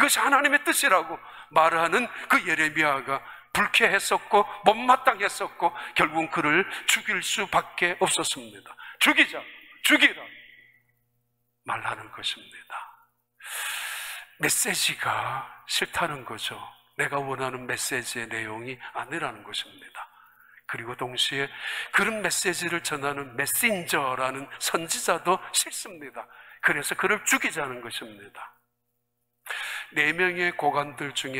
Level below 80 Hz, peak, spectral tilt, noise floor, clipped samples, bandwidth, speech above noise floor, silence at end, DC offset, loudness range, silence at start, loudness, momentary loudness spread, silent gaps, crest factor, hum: -66 dBFS; -2 dBFS; -1.5 dB/octave; -78 dBFS; under 0.1%; 16 kHz; 52 dB; 0 s; under 0.1%; 9 LU; 0 s; -25 LUFS; 17 LU; none; 26 dB; none